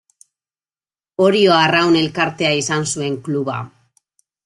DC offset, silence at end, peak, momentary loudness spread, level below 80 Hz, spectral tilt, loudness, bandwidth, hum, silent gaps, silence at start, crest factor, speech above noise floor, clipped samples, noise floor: under 0.1%; 0.8 s; -2 dBFS; 13 LU; -60 dBFS; -4 dB/octave; -16 LUFS; 12 kHz; none; none; 1.2 s; 16 dB; over 74 dB; under 0.1%; under -90 dBFS